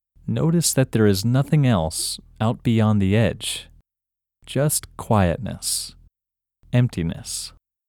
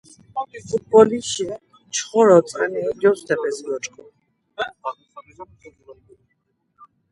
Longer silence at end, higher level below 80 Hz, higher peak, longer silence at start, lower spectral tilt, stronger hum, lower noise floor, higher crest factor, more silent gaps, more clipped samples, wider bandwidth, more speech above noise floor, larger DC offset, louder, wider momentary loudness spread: second, 0.4 s vs 1.2 s; first, -46 dBFS vs -62 dBFS; second, -4 dBFS vs 0 dBFS; about the same, 0.25 s vs 0.35 s; about the same, -5 dB/octave vs -4 dB/octave; neither; first, -87 dBFS vs -70 dBFS; about the same, 18 dB vs 22 dB; neither; neither; first, 19 kHz vs 11.5 kHz; first, 66 dB vs 50 dB; neither; about the same, -21 LUFS vs -20 LUFS; second, 10 LU vs 19 LU